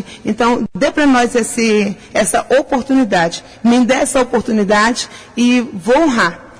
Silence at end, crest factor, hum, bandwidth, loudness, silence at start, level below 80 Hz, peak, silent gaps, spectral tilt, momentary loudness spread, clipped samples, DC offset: 0.1 s; 12 dB; none; 11 kHz; -14 LUFS; 0 s; -42 dBFS; -2 dBFS; none; -4 dB/octave; 5 LU; under 0.1%; under 0.1%